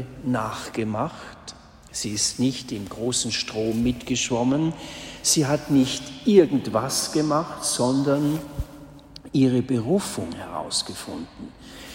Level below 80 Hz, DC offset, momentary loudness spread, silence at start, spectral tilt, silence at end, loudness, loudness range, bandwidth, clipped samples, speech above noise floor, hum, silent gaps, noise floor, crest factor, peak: -48 dBFS; under 0.1%; 15 LU; 0 s; -4.5 dB/octave; 0 s; -23 LUFS; 5 LU; 16.5 kHz; under 0.1%; 20 dB; none; none; -44 dBFS; 20 dB; -4 dBFS